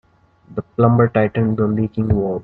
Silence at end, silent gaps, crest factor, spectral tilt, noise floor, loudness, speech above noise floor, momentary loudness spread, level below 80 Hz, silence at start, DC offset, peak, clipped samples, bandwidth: 0 s; none; 16 dB; -12 dB/octave; -47 dBFS; -17 LUFS; 31 dB; 13 LU; -42 dBFS; 0.5 s; under 0.1%; -2 dBFS; under 0.1%; 4.1 kHz